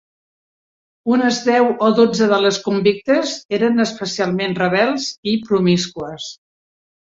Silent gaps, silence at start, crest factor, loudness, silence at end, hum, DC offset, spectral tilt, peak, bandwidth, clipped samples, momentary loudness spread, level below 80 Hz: 3.45-3.49 s, 5.18-5.23 s; 1.05 s; 16 dB; -17 LUFS; 0.85 s; none; under 0.1%; -5 dB/octave; -2 dBFS; 7.8 kHz; under 0.1%; 10 LU; -58 dBFS